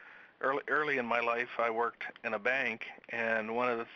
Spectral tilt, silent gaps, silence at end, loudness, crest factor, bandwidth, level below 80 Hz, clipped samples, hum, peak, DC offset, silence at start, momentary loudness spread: -1.5 dB/octave; none; 0 s; -33 LUFS; 18 dB; 7 kHz; -82 dBFS; under 0.1%; none; -16 dBFS; under 0.1%; 0 s; 6 LU